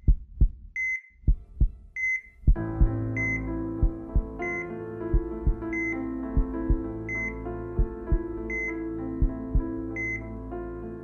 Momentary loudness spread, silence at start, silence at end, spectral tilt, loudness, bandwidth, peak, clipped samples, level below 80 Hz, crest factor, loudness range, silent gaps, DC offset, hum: 6 LU; 0 s; 0 s; -9 dB/octave; -30 LUFS; 6.6 kHz; -10 dBFS; under 0.1%; -28 dBFS; 16 dB; 3 LU; none; under 0.1%; none